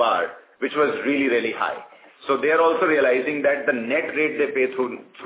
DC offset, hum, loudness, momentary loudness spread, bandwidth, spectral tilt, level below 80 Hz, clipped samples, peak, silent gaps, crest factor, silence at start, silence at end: under 0.1%; none; -21 LUFS; 10 LU; 4 kHz; -8 dB/octave; -70 dBFS; under 0.1%; -6 dBFS; none; 16 dB; 0 s; 0 s